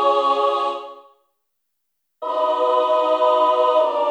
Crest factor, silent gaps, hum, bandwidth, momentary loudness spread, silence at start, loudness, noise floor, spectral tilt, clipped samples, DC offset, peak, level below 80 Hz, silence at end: 14 dB; none; none; 9 kHz; 12 LU; 0 s; -18 LUFS; -76 dBFS; -1.5 dB/octave; under 0.1%; under 0.1%; -6 dBFS; -88 dBFS; 0 s